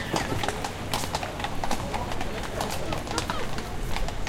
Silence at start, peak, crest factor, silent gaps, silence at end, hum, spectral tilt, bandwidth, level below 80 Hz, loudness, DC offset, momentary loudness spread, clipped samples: 0 s; -4 dBFS; 24 dB; none; 0 s; none; -4 dB/octave; 16.5 kHz; -36 dBFS; -31 LUFS; under 0.1%; 4 LU; under 0.1%